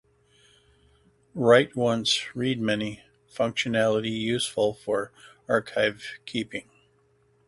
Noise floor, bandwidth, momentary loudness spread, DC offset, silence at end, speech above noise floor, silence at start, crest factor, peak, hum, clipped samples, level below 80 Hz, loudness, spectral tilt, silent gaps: -65 dBFS; 11.5 kHz; 19 LU; under 0.1%; 0.85 s; 39 dB; 1.35 s; 22 dB; -6 dBFS; none; under 0.1%; -62 dBFS; -25 LUFS; -4.5 dB/octave; none